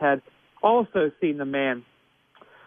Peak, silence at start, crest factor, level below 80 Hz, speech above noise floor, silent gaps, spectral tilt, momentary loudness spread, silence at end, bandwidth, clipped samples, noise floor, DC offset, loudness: -6 dBFS; 0 s; 18 dB; -68 dBFS; 34 dB; none; -9 dB/octave; 7 LU; 0.85 s; 3.7 kHz; under 0.1%; -57 dBFS; under 0.1%; -25 LUFS